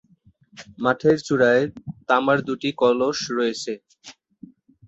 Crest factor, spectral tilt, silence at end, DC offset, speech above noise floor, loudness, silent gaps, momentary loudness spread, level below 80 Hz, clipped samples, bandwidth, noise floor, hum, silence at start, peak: 18 dB; -5 dB/octave; 0.75 s; under 0.1%; 36 dB; -21 LUFS; none; 12 LU; -62 dBFS; under 0.1%; 8 kHz; -58 dBFS; none; 0.55 s; -4 dBFS